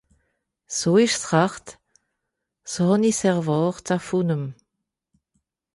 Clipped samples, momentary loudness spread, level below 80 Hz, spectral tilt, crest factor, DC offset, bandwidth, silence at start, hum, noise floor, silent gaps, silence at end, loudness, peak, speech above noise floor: under 0.1%; 13 LU; -62 dBFS; -5 dB/octave; 18 dB; under 0.1%; 11.5 kHz; 0.7 s; none; -81 dBFS; none; 1.2 s; -22 LUFS; -6 dBFS; 60 dB